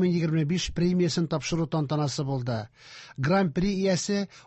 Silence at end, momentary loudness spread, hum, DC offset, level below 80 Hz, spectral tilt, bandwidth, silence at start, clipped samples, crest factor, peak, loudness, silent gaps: 0.05 s; 8 LU; none; under 0.1%; -50 dBFS; -6 dB/octave; 8.4 kHz; 0 s; under 0.1%; 14 dB; -14 dBFS; -27 LUFS; none